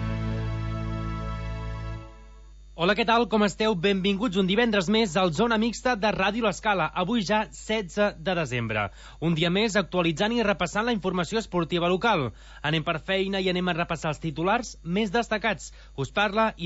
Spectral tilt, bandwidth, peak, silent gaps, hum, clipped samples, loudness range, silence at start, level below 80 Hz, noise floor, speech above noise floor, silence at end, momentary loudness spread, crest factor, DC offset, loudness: -5 dB/octave; 8 kHz; -10 dBFS; none; none; under 0.1%; 3 LU; 0 s; -42 dBFS; -47 dBFS; 22 dB; 0 s; 9 LU; 16 dB; under 0.1%; -26 LUFS